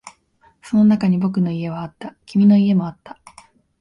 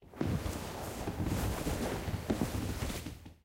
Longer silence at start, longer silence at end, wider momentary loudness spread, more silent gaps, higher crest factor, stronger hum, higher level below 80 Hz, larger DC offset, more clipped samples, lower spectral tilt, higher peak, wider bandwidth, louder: about the same, 0.05 s vs 0 s; first, 0.7 s vs 0.1 s; first, 17 LU vs 6 LU; neither; about the same, 14 dB vs 18 dB; neither; second, -56 dBFS vs -44 dBFS; neither; neither; first, -8.5 dB/octave vs -5.5 dB/octave; first, -6 dBFS vs -18 dBFS; second, 10 kHz vs 16 kHz; first, -17 LUFS vs -37 LUFS